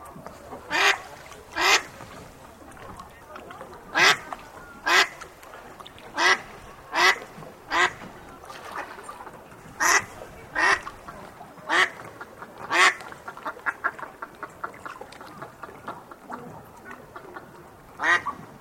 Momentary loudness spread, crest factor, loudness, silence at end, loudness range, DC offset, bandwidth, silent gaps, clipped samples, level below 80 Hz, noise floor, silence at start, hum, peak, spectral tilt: 23 LU; 26 dB; -23 LUFS; 0.15 s; 11 LU; under 0.1%; 16.5 kHz; none; under 0.1%; -58 dBFS; -47 dBFS; 0 s; none; -2 dBFS; -1 dB/octave